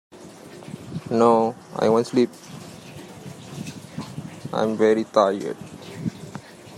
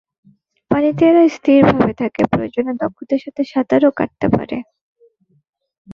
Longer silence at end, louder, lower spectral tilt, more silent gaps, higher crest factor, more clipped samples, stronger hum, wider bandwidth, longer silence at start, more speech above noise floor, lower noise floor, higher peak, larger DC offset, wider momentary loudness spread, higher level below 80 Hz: about the same, 0 s vs 0 s; second, -22 LUFS vs -16 LUFS; second, -6 dB/octave vs -8 dB/octave; second, none vs 4.81-4.95 s, 5.49-5.53 s, 5.78-5.85 s; about the same, 20 dB vs 16 dB; neither; neither; first, 14.5 kHz vs 7 kHz; second, 0.15 s vs 0.7 s; second, 22 dB vs 40 dB; second, -42 dBFS vs -55 dBFS; about the same, -4 dBFS vs -2 dBFS; neither; first, 21 LU vs 10 LU; second, -64 dBFS vs -48 dBFS